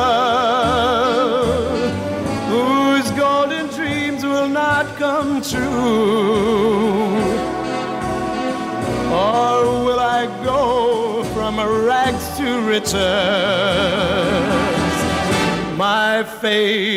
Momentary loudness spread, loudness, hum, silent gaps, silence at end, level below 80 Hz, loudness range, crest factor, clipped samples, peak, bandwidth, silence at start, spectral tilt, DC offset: 6 LU; -17 LUFS; none; none; 0 s; -42 dBFS; 2 LU; 12 dB; under 0.1%; -4 dBFS; 16 kHz; 0 s; -4.5 dB/octave; under 0.1%